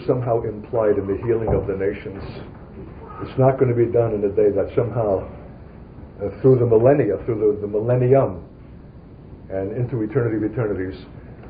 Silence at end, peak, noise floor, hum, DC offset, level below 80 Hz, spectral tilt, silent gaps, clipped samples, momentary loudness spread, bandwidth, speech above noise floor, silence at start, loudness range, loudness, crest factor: 0 s; -4 dBFS; -41 dBFS; none; under 0.1%; -42 dBFS; -13.5 dB/octave; none; under 0.1%; 21 LU; 4.9 kHz; 22 dB; 0 s; 4 LU; -20 LUFS; 18 dB